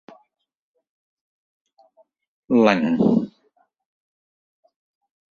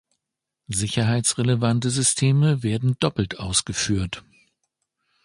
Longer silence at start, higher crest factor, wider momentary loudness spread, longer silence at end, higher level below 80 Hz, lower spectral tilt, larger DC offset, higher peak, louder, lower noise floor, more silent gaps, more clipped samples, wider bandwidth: first, 2.5 s vs 0.7 s; first, 24 dB vs 18 dB; about the same, 7 LU vs 8 LU; first, 2.05 s vs 1.05 s; second, -64 dBFS vs -46 dBFS; first, -7.5 dB/octave vs -4.5 dB/octave; neither; about the same, -2 dBFS vs -4 dBFS; first, -19 LUFS vs -22 LUFS; second, -65 dBFS vs -84 dBFS; neither; neither; second, 7 kHz vs 11.5 kHz